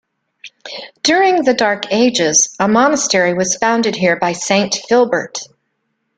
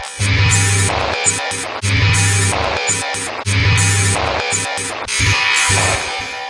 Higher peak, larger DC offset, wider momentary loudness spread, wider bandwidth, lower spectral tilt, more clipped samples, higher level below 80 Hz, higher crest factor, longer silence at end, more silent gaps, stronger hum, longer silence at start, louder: about the same, 0 dBFS vs 0 dBFS; neither; first, 14 LU vs 7 LU; about the same, 10.5 kHz vs 11.5 kHz; about the same, -2.5 dB/octave vs -2.5 dB/octave; neither; second, -58 dBFS vs -34 dBFS; about the same, 16 dB vs 16 dB; first, 0.7 s vs 0 s; neither; neither; first, 0.45 s vs 0 s; about the same, -14 LUFS vs -15 LUFS